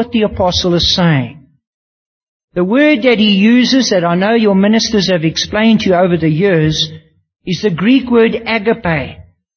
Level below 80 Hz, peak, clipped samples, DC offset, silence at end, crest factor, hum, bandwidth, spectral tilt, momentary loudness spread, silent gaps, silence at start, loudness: -38 dBFS; 0 dBFS; under 0.1%; under 0.1%; 0.35 s; 12 dB; none; 6.6 kHz; -5.5 dB/octave; 8 LU; 1.67-2.48 s; 0 s; -12 LUFS